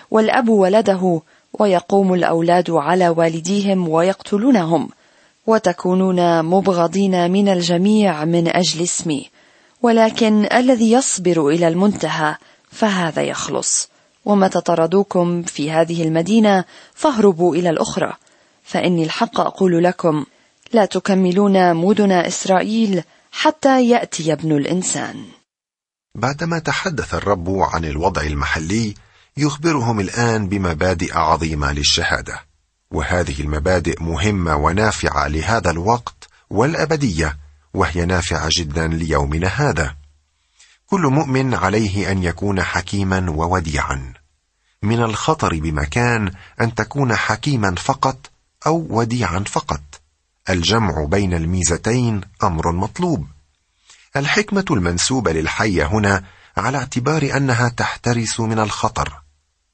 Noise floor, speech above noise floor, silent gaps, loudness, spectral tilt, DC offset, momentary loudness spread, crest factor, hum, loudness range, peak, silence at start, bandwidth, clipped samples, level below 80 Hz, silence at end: -89 dBFS; 72 dB; none; -17 LUFS; -5 dB/octave; under 0.1%; 8 LU; 16 dB; none; 5 LU; -2 dBFS; 0.1 s; 8.8 kHz; under 0.1%; -36 dBFS; 0.55 s